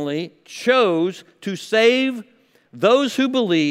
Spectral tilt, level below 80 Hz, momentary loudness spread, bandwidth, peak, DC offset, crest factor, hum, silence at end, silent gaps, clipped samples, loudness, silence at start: -4.5 dB/octave; -76 dBFS; 14 LU; 15 kHz; -2 dBFS; under 0.1%; 16 dB; none; 0 s; none; under 0.1%; -19 LUFS; 0 s